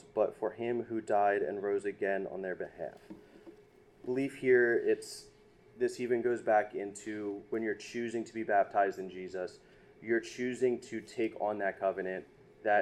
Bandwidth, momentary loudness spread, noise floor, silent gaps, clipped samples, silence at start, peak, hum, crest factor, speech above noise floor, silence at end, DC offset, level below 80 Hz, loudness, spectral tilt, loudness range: 12.5 kHz; 13 LU; -60 dBFS; none; under 0.1%; 0.15 s; -16 dBFS; none; 18 dB; 27 dB; 0 s; under 0.1%; -72 dBFS; -34 LUFS; -5.5 dB/octave; 4 LU